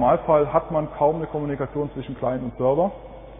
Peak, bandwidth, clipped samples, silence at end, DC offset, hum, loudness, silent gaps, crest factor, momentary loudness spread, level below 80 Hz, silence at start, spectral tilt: -6 dBFS; 3.8 kHz; under 0.1%; 0 s; under 0.1%; none; -23 LUFS; none; 18 dB; 9 LU; -44 dBFS; 0 s; -12 dB/octave